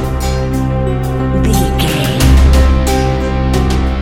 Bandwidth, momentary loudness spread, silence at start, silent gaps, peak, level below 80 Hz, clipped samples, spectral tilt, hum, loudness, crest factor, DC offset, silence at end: 16.5 kHz; 7 LU; 0 s; none; 0 dBFS; -14 dBFS; under 0.1%; -6 dB/octave; none; -13 LUFS; 12 dB; under 0.1%; 0 s